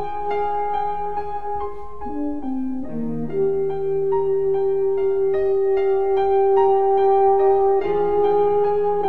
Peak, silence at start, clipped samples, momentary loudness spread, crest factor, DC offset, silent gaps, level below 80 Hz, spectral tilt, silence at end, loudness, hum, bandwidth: -8 dBFS; 0 s; under 0.1%; 11 LU; 12 dB; 4%; none; -48 dBFS; -9 dB/octave; 0 s; -20 LUFS; none; 4.3 kHz